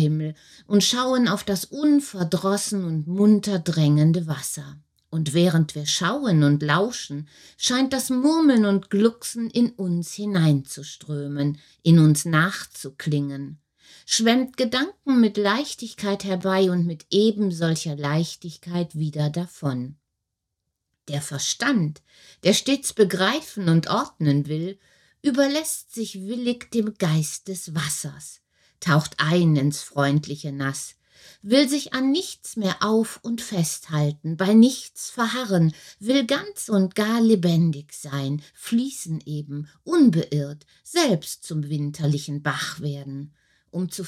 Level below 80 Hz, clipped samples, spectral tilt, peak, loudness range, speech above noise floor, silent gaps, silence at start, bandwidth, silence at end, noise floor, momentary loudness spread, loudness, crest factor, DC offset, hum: -64 dBFS; under 0.1%; -5 dB/octave; -4 dBFS; 4 LU; 59 dB; none; 0 s; 15 kHz; 0 s; -81 dBFS; 13 LU; -23 LUFS; 18 dB; under 0.1%; none